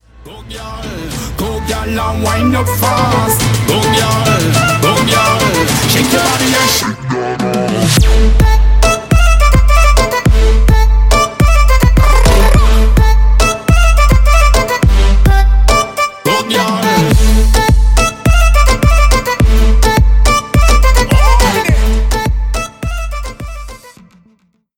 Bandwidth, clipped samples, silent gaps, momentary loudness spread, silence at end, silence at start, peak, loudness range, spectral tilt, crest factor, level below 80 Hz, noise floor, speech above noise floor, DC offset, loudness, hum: 17 kHz; under 0.1%; none; 9 LU; 1 s; 0.25 s; 0 dBFS; 3 LU; -4.5 dB/octave; 8 dB; -10 dBFS; -54 dBFS; 41 dB; under 0.1%; -11 LUFS; none